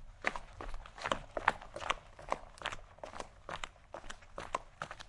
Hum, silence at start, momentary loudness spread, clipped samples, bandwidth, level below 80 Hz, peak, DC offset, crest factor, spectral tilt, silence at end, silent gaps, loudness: none; 0 s; 14 LU; under 0.1%; 11.5 kHz; -52 dBFS; -8 dBFS; under 0.1%; 34 dB; -3 dB/octave; 0 s; none; -41 LUFS